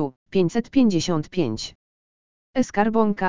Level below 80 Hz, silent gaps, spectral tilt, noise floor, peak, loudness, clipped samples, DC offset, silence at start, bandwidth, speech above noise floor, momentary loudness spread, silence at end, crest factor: -52 dBFS; 0.16-0.26 s, 1.75-2.54 s; -6 dB/octave; under -90 dBFS; -4 dBFS; -22 LUFS; under 0.1%; 1%; 0 s; 7.6 kHz; over 69 dB; 9 LU; 0 s; 18 dB